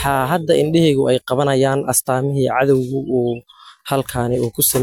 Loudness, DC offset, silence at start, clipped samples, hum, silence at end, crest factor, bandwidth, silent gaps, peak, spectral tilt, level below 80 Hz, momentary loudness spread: -17 LUFS; under 0.1%; 0 s; under 0.1%; none; 0 s; 14 dB; 17 kHz; none; -4 dBFS; -5 dB/octave; -46 dBFS; 7 LU